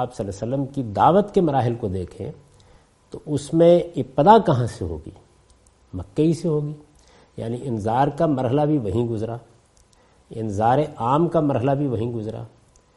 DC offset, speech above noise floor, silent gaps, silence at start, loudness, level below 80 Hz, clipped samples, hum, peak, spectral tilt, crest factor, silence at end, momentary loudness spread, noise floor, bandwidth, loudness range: under 0.1%; 36 dB; none; 0 s; -21 LUFS; -52 dBFS; under 0.1%; none; -2 dBFS; -8 dB/octave; 20 dB; 0.5 s; 20 LU; -56 dBFS; 11.5 kHz; 5 LU